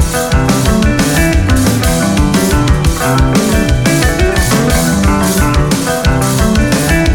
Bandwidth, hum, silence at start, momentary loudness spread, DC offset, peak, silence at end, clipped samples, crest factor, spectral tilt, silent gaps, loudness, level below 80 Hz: 19.5 kHz; none; 0 s; 1 LU; under 0.1%; 0 dBFS; 0 s; under 0.1%; 10 dB; -5 dB/octave; none; -11 LUFS; -16 dBFS